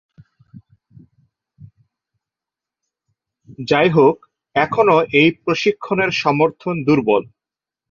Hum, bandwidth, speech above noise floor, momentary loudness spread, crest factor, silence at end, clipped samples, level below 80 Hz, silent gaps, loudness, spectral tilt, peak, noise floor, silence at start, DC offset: none; 7.2 kHz; 72 dB; 7 LU; 18 dB; 0.7 s; under 0.1%; -58 dBFS; none; -16 LUFS; -6.5 dB/octave; -2 dBFS; -88 dBFS; 0.55 s; under 0.1%